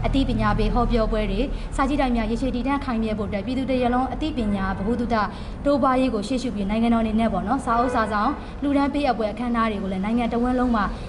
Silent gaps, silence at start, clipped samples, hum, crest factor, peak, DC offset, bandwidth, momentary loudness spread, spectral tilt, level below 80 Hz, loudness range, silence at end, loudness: none; 0 s; under 0.1%; none; 14 dB; -8 dBFS; under 0.1%; 11.5 kHz; 5 LU; -7 dB/octave; -32 dBFS; 2 LU; 0 s; -23 LUFS